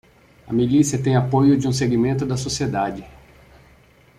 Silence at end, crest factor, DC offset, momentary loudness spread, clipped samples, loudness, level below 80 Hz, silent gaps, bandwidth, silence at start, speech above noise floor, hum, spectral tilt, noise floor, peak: 1.1 s; 16 dB; under 0.1%; 8 LU; under 0.1%; -20 LUFS; -48 dBFS; none; 14 kHz; 0.45 s; 33 dB; none; -6 dB/octave; -52 dBFS; -4 dBFS